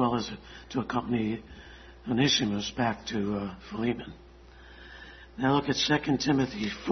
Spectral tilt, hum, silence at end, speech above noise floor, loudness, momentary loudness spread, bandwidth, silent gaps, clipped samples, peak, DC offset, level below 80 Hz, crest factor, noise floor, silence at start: -4.5 dB/octave; none; 0 s; 22 dB; -29 LUFS; 21 LU; 6.4 kHz; none; under 0.1%; -10 dBFS; under 0.1%; -52 dBFS; 20 dB; -51 dBFS; 0 s